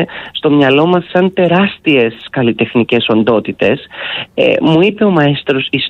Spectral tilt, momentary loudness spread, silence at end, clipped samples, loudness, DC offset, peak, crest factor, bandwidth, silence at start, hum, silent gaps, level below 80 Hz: -8 dB/octave; 7 LU; 0 s; under 0.1%; -12 LUFS; under 0.1%; 0 dBFS; 12 dB; 6.8 kHz; 0 s; none; none; -50 dBFS